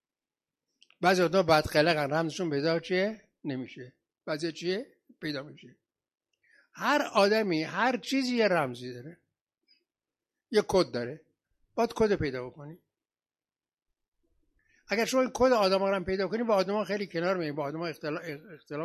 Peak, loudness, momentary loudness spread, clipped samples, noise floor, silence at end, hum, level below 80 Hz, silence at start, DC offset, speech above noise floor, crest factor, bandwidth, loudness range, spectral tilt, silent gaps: -8 dBFS; -29 LUFS; 17 LU; under 0.1%; under -90 dBFS; 0 s; none; -58 dBFS; 1 s; under 0.1%; over 62 dB; 22 dB; 13 kHz; 7 LU; -5 dB/octave; 9.41-9.45 s, 14.08-14.12 s